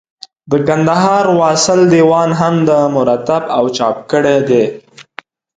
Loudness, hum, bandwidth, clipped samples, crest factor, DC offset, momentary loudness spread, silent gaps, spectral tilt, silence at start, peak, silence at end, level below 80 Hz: -12 LUFS; none; 9.4 kHz; under 0.1%; 12 dB; under 0.1%; 6 LU; none; -5.5 dB/octave; 0.45 s; 0 dBFS; 0.55 s; -52 dBFS